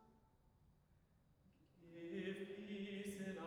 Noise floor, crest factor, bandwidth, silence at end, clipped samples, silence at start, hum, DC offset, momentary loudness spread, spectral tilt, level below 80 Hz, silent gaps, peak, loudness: -75 dBFS; 16 dB; 18 kHz; 0 s; under 0.1%; 0 s; none; under 0.1%; 12 LU; -5.5 dB/octave; -80 dBFS; none; -36 dBFS; -50 LUFS